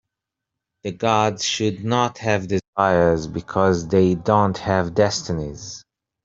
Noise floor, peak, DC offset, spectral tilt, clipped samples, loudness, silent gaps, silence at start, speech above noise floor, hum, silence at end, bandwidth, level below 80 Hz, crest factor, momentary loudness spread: -84 dBFS; -2 dBFS; under 0.1%; -5 dB/octave; under 0.1%; -20 LUFS; 2.68-2.73 s; 0.85 s; 64 dB; none; 0.45 s; 7.8 kHz; -50 dBFS; 18 dB; 13 LU